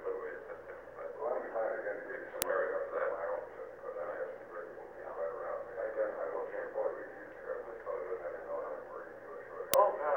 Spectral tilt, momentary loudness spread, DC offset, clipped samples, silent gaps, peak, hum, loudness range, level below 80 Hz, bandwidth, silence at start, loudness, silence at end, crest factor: -2.5 dB/octave; 13 LU; under 0.1%; under 0.1%; none; -2 dBFS; none; 3 LU; -72 dBFS; over 20 kHz; 0 s; -38 LUFS; 0 s; 36 dB